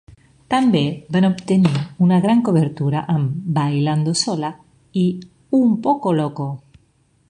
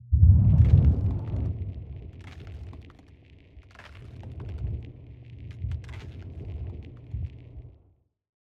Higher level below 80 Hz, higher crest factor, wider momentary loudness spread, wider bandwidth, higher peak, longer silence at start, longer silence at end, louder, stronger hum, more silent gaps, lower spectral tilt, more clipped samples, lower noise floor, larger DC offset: second, -56 dBFS vs -34 dBFS; about the same, 16 dB vs 20 dB; second, 9 LU vs 27 LU; first, 10.5 kHz vs 4 kHz; first, -2 dBFS vs -6 dBFS; first, 0.5 s vs 0.1 s; about the same, 0.7 s vs 0.8 s; first, -19 LUFS vs -25 LUFS; neither; neither; second, -6.5 dB/octave vs -10.5 dB/octave; neither; second, -59 dBFS vs -64 dBFS; neither